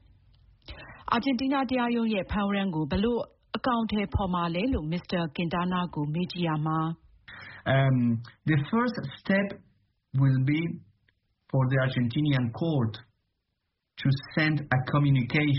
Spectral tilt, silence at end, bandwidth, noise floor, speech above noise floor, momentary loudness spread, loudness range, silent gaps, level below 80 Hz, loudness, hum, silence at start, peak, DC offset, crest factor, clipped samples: -6 dB/octave; 0 s; 5.8 kHz; -81 dBFS; 54 dB; 11 LU; 2 LU; none; -48 dBFS; -28 LUFS; none; 0.7 s; -10 dBFS; under 0.1%; 18 dB; under 0.1%